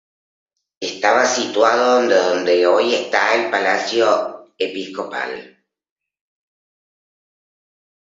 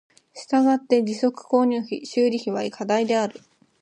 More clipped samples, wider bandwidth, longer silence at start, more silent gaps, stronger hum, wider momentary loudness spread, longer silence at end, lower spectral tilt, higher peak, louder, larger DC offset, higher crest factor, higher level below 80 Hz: neither; second, 7.8 kHz vs 10 kHz; first, 0.8 s vs 0.35 s; neither; neither; first, 12 LU vs 8 LU; first, 2.55 s vs 0.5 s; second, -2 dB/octave vs -5 dB/octave; first, 0 dBFS vs -6 dBFS; first, -17 LUFS vs -22 LUFS; neither; about the same, 18 dB vs 16 dB; first, -70 dBFS vs -76 dBFS